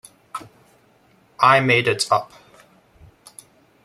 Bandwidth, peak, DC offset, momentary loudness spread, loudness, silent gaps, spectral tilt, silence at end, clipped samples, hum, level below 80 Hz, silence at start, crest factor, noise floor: 15 kHz; -2 dBFS; under 0.1%; 21 LU; -17 LUFS; none; -4 dB/octave; 1.6 s; under 0.1%; none; -64 dBFS; 0.35 s; 22 dB; -57 dBFS